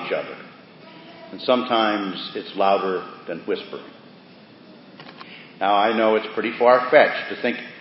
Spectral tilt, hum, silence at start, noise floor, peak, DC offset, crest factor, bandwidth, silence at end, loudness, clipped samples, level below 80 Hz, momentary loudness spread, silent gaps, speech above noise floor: -9 dB/octave; none; 0 s; -47 dBFS; 0 dBFS; under 0.1%; 22 dB; 5.8 kHz; 0 s; -21 LUFS; under 0.1%; -76 dBFS; 24 LU; none; 26 dB